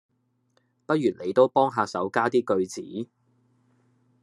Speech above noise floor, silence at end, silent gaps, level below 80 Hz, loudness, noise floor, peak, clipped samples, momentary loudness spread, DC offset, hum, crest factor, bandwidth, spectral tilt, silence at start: 45 dB; 1.15 s; none; -78 dBFS; -25 LUFS; -69 dBFS; -6 dBFS; under 0.1%; 15 LU; under 0.1%; none; 20 dB; 12 kHz; -6 dB/octave; 0.9 s